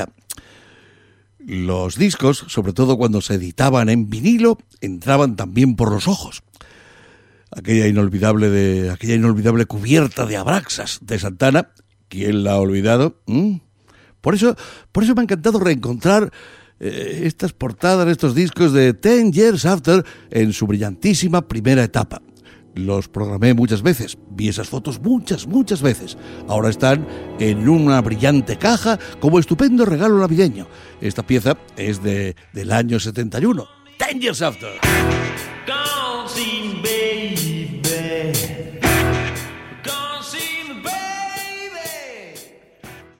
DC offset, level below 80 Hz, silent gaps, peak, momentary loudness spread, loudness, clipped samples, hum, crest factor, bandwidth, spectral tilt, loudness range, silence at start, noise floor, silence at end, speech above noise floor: under 0.1%; -42 dBFS; none; 0 dBFS; 13 LU; -18 LUFS; under 0.1%; none; 16 dB; 16.5 kHz; -5.5 dB/octave; 5 LU; 0 s; -53 dBFS; 0.2 s; 36 dB